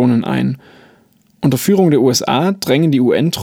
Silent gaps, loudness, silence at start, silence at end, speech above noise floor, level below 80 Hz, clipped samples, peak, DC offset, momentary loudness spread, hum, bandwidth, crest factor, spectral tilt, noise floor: none; -14 LUFS; 0 s; 0 s; 39 dB; -54 dBFS; under 0.1%; -2 dBFS; under 0.1%; 7 LU; none; 17.5 kHz; 14 dB; -5.5 dB/octave; -52 dBFS